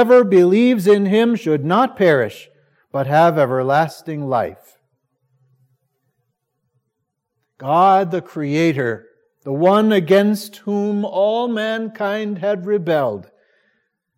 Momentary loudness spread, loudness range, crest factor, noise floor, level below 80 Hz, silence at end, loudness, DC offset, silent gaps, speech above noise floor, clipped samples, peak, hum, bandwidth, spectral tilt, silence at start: 11 LU; 8 LU; 16 dB; -75 dBFS; -70 dBFS; 0.95 s; -17 LUFS; under 0.1%; none; 59 dB; under 0.1%; -2 dBFS; none; 16.5 kHz; -7 dB/octave; 0 s